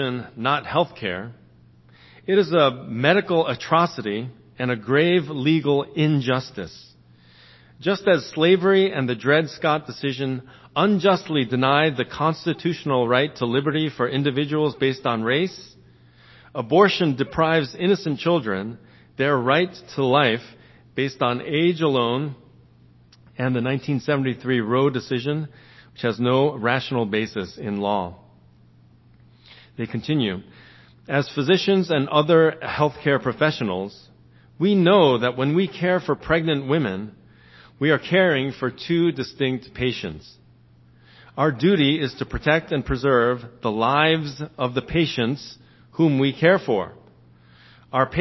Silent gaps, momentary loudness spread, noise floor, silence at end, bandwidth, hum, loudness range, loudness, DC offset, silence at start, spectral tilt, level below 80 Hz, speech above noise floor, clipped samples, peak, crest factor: none; 11 LU; -53 dBFS; 0 s; 6.2 kHz; none; 4 LU; -21 LUFS; under 0.1%; 0 s; -7 dB/octave; -52 dBFS; 32 dB; under 0.1%; 0 dBFS; 22 dB